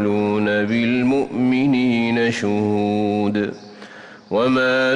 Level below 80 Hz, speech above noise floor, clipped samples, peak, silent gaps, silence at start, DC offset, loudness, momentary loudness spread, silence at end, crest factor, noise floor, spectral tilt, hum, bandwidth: -58 dBFS; 21 dB; under 0.1%; -8 dBFS; none; 0 s; under 0.1%; -19 LUFS; 9 LU; 0 s; 10 dB; -40 dBFS; -6.5 dB/octave; none; 10 kHz